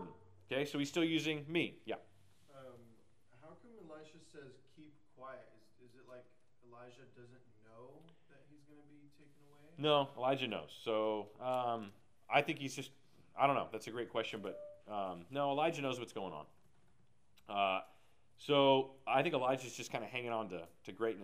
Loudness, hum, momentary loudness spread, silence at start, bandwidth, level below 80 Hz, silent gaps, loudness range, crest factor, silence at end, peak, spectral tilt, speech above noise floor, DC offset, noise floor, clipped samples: -38 LUFS; none; 24 LU; 0 s; 15.5 kHz; -82 dBFS; none; 22 LU; 24 dB; 0 s; -16 dBFS; -5 dB/octave; 36 dB; under 0.1%; -74 dBFS; under 0.1%